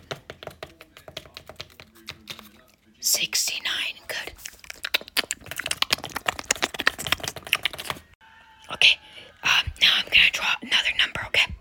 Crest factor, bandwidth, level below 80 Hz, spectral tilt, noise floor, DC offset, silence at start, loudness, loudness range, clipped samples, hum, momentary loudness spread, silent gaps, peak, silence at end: 26 dB; 17 kHz; -52 dBFS; 0 dB/octave; -56 dBFS; under 0.1%; 0.1 s; -22 LUFS; 8 LU; under 0.1%; none; 23 LU; 8.15-8.20 s; 0 dBFS; 0 s